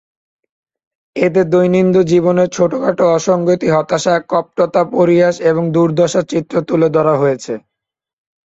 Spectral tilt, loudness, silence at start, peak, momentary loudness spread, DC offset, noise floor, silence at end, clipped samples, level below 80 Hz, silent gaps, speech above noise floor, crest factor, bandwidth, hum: -6.5 dB/octave; -13 LUFS; 1.15 s; 0 dBFS; 6 LU; under 0.1%; -82 dBFS; 0.85 s; under 0.1%; -54 dBFS; none; 69 dB; 14 dB; 8 kHz; none